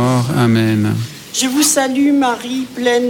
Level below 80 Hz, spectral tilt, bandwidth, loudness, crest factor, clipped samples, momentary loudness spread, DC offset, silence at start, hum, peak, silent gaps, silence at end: -52 dBFS; -4.5 dB/octave; 17.5 kHz; -15 LUFS; 12 dB; under 0.1%; 9 LU; under 0.1%; 0 s; none; -2 dBFS; none; 0 s